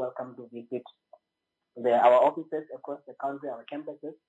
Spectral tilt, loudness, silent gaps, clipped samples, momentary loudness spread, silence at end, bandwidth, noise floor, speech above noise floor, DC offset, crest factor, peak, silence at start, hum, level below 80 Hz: -6.5 dB/octave; -27 LUFS; none; under 0.1%; 20 LU; 0.15 s; 7.8 kHz; -84 dBFS; 56 dB; under 0.1%; 20 dB; -8 dBFS; 0 s; none; under -90 dBFS